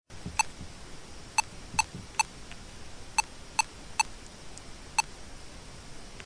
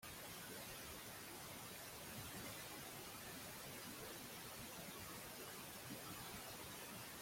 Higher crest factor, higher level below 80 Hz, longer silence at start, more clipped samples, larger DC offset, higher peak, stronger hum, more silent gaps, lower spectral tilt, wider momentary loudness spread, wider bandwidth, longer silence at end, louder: first, 26 dB vs 14 dB; first, -50 dBFS vs -72 dBFS; about the same, 0.1 s vs 0 s; neither; neither; first, -10 dBFS vs -38 dBFS; neither; neither; second, -1 dB/octave vs -2.5 dB/octave; first, 16 LU vs 1 LU; second, 10.5 kHz vs 16.5 kHz; about the same, 0 s vs 0 s; first, -32 LUFS vs -52 LUFS